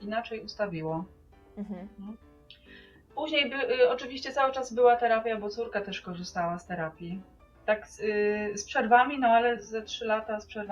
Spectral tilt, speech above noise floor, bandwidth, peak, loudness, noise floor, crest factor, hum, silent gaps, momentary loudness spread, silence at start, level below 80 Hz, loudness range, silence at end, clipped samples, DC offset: -4 dB/octave; 25 dB; 10 kHz; -8 dBFS; -28 LUFS; -54 dBFS; 22 dB; none; none; 18 LU; 0 s; -60 dBFS; 6 LU; 0 s; under 0.1%; under 0.1%